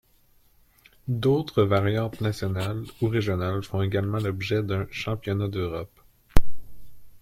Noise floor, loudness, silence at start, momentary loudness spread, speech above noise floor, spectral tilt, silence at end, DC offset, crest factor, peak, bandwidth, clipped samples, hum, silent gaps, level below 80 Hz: -60 dBFS; -27 LUFS; 1.05 s; 8 LU; 34 dB; -7 dB/octave; 0.05 s; under 0.1%; 20 dB; -2 dBFS; 15.5 kHz; under 0.1%; none; none; -36 dBFS